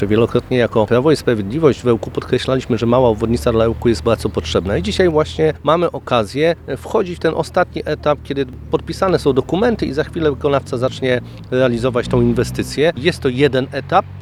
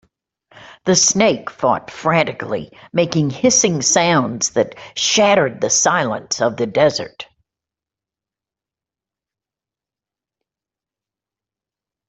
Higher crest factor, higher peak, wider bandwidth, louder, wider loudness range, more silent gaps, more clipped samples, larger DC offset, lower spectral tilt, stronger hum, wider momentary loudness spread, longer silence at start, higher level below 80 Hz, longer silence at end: about the same, 16 dB vs 18 dB; about the same, 0 dBFS vs -2 dBFS; first, 13.5 kHz vs 8.4 kHz; about the same, -17 LUFS vs -16 LUFS; second, 2 LU vs 8 LU; neither; neither; neither; first, -6.5 dB/octave vs -3 dB/octave; neither; second, 5 LU vs 12 LU; second, 0 s vs 0.6 s; first, -36 dBFS vs -58 dBFS; second, 0 s vs 4.85 s